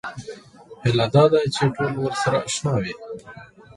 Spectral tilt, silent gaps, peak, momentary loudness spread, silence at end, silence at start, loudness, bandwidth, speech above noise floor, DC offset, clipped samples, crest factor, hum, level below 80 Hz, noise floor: -5.5 dB/octave; none; -4 dBFS; 21 LU; 0.3 s; 0.05 s; -21 LUFS; 11.5 kHz; 24 dB; under 0.1%; under 0.1%; 18 dB; none; -52 dBFS; -44 dBFS